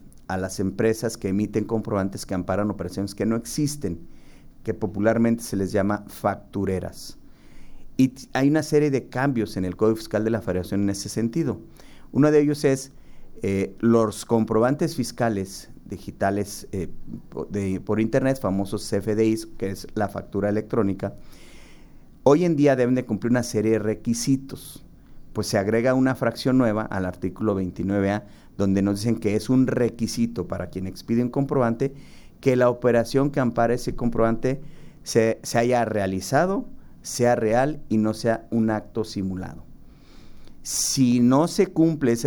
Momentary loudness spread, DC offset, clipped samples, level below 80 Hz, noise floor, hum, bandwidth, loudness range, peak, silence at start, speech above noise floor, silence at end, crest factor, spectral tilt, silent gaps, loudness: 12 LU; under 0.1%; under 0.1%; -46 dBFS; -46 dBFS; none; over 20 kHz; 4 LU; -4 dBFS; 0 s; 23 dB; 0 s; 20 dB; -6 dB/octave; none; -24 LUFS